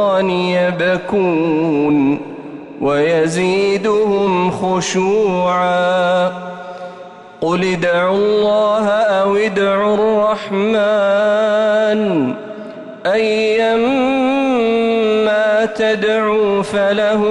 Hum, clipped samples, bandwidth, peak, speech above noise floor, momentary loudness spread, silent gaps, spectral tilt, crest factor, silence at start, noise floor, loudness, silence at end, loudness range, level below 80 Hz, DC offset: none; under 0.1%; 11.5 kHz; -6 dBFS; 21 dB; 8 LU; none; -5.5 dB/octave; 8 dB; 0 s; -35 dBFS; -15 LUFS; 0 s; 2 LU; -52 dBFS; under 0.1%